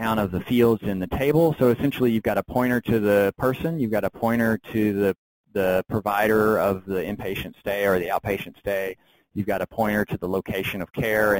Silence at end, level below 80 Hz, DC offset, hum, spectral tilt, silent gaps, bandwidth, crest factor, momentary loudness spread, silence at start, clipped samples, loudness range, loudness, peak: 0 s; -48 dBFS; under 0.1%; none; -7 dB/octave; 5.18-5.44 s; 17 kHz; 16 dB; 9 LU; 0 s; under 0.1%; 5 LU; -23 LUFS; -8 dBFS